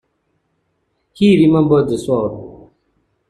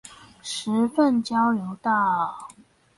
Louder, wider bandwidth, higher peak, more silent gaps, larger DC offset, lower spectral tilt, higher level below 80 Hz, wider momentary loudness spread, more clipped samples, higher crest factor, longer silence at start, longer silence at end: first, -14 LUFS vs -23 LUFS; about the same, 11.5 kHz vs 11.5 kHz; first, -2 dBFS vs -10 dBFS; neither; neither; first, -7.5 dB/octave vs -4.5 dB/octave; first, -48 dBFS vs -68 dBFS; about the same, 11 LU vs 11 LU; neither; about the same, 16 dB vs 16 dB; first, 1.2 s vs 0.05 s; first, 0.75 s vs 0.5 s